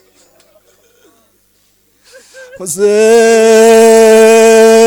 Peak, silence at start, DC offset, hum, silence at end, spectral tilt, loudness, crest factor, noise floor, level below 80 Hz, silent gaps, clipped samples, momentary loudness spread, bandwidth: 0 dBFS; 2.6 s; under 0.1%; 50 Hz at -55 dBFS; 0 s; -3 dB/octave; -5 LUFS; 8 dB; -53 dBFS; -56 dBFS; none; 0.7%; 9 LU; 18 kHz